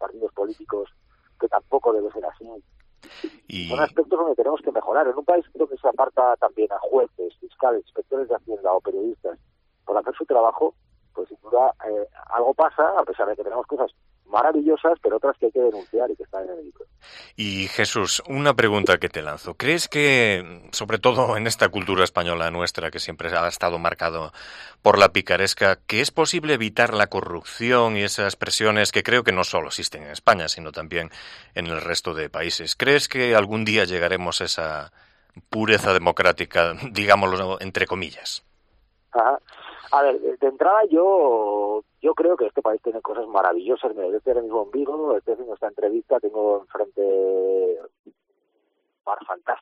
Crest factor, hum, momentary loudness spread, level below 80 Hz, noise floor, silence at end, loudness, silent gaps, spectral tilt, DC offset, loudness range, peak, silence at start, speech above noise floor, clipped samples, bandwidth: 22 dB; none; 12 LU; -56 dBFS; -71 dBFS; 0 s; -22 LUFS; 47.99-48.04 s; -3.5 dB/octave; under 0.1%; 5 LU; 0 dBFS; 0 s; 49 dB; under 0.1%; 14.5 kHz